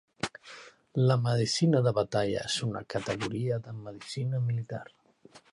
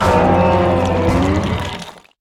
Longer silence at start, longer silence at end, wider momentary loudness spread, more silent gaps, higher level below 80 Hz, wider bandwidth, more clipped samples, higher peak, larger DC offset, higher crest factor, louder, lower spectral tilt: first, 0.25 s vs 0 s; second, 0.15 s vs 0.3 s; about the same, 16 LU vs 14 LU; neither; second, -62 dBFS vs -32 dBFS; second, 11.5 kHz vs 13.5 kHz; neither; second, -12 dBFS vs -2 dBFS; neither; about the same, 18 dB vs 14 dB; second, -30 LUFS vs -15 LUFS; second, -5.5 dB/octave vs -7 dB/octave